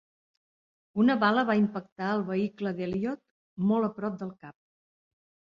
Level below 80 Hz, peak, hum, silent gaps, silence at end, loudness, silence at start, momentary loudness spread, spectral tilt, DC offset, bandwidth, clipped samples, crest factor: -68 dBFS; -10 dBFS; none; 1.92-1.96 s, 3.31-3.57 s; 1.1 s; -28 LUFS; 0.95 s; 14 LU; -8 dB/octave; under 0.1%; 6.2 kHz; under 0.1%; 20 dB